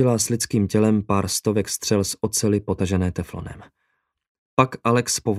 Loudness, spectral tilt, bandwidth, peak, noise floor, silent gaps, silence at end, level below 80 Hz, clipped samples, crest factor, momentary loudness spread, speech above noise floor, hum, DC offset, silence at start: -21 LUFS; -5 dB/octave; 16 kHz; 0 dBFS; -73 dBFS; 4.29-4.57 s; 0 s; -48 dBFS; under 0.1%; 20 dB; 7 LU; 52 dB; none; under 0.1%; 0 s